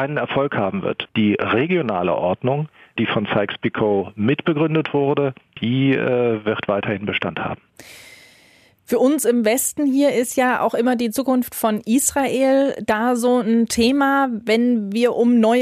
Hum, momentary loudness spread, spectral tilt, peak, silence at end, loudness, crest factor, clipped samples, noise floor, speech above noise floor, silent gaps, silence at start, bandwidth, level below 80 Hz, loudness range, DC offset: none; 6 LU; -5 dB/octave; -4 dBFS; 0 s; -19 LUFS; 14 dB; under 0.1%; -53 dBFS; 34 dB; none; 0 s; 15.5 kHz; -56 dBFS; 4 LU; under 0.1%